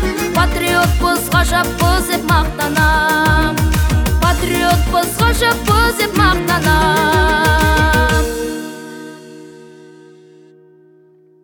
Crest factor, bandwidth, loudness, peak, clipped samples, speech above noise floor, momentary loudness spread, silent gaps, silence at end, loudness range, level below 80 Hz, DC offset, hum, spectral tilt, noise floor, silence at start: 14 dB; over 20 kHz; -14 LUFS; 0 dBFS; under 0.1%; 35 dB; 5 LU; none; 1.75 s; 6 LU; -22 dBFS; under 0.1%; none; -4.5 dB/octave; -48 dBFS; 0 s